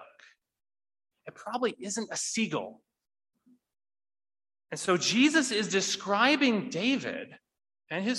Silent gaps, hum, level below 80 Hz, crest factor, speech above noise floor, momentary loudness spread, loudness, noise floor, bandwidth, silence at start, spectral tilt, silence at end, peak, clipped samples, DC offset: none; none; -78 dBFS; 22 dB; 32 dB; 15 LU; -28 LUFS; -61 dBFS; 12 kHz; 0 s; -3 dB/octave; 0 s; -8 dBFS; under 0.1%; under 0.1%